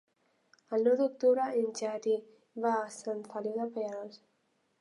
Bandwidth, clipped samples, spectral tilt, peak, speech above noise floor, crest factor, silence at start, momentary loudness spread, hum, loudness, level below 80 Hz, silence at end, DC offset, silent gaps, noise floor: 11 kHz; under 0.1%; -4.5 dB/octave; -16 dBFS; 44 dB; 16 dB; 0.7 s; 11 LU; none; -32 LUFS; under -90 dBFS; 0.65 s; under 0.1%; none; -75 dBFS